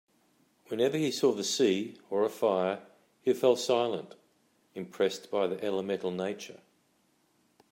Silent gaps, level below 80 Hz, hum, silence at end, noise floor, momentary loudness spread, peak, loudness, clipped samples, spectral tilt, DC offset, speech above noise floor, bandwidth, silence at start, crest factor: none; -82 dBFS; none; 1.15 s; -71 dBFS; 14 LU; -12 dBFS; -30 LUFS; under 0.1%; -4.5 dB/octave; under 0.1%; 41 dB; 16 kHz; 0.7 s; 18 dB